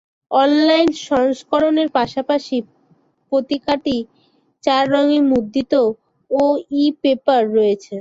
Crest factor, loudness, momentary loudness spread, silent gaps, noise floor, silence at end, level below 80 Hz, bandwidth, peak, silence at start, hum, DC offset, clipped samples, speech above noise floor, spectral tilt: 16 dB; -17 LUFS; 8 LU; none; -59 dBFS; 0 s; -56 dBFS; 7.8 kHz; -2 dBFS; 0.3 s; none; under 0.1%; under 0.1%; 43 dB; -5 dB/octave